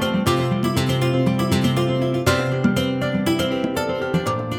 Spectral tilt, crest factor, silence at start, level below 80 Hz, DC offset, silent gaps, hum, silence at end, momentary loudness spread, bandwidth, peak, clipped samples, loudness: -6 dB/octave; 16 dB; 0 s; -44 dBFS; under 0.1%; none; none; 0 s; 3 LU; 18.5 kHz; -4 dBFS; under 0.1%; -20 LUFS